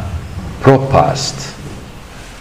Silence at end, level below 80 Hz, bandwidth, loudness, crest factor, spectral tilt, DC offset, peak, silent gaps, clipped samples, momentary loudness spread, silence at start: 0 s; -32 dBFS; 15.5 kHz; -13 LUFS; 16 dB; -5.5 dB/octave; under 0.1%; 0 dBFS; none; 0.7%; 22 LU; 0 s